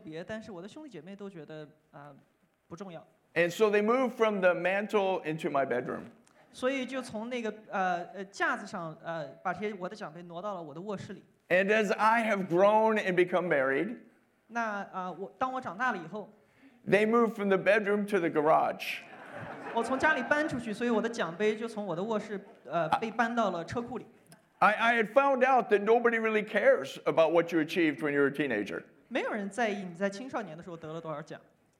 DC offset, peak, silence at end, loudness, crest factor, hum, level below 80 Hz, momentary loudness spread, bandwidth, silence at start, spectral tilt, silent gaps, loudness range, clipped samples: under 0.1%; -10 dBFS; 0.4 s; -29 LUFS; 20 dB; none; -74 dBFS; 18 LU; 15 kHz; 0.05 s; -5.5 dB/octave; none; 8 LU; under 0.1%